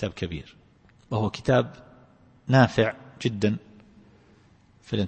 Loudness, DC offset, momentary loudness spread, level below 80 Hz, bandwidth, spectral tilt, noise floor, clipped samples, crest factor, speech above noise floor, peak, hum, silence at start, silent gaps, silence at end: -25 LUFS; under 0.1%; 15 LU; -52 dBFS; 8.6 kHz; -7 dB/octave; -57 dBFS; under 0.1%; 22 dB; 34 dB; -4 dBFS; none; 0 s; none; 0 s